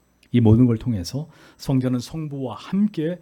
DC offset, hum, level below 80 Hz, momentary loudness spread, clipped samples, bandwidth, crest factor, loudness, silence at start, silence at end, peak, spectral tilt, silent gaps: under 0.1%; none; -46 dBFS; 15 LU; under 0.1%; 14 kHz; 18 dB; -22 LUFS; 0.35 s; 0.05 s; -4 dBFS; -8 dB/octave; none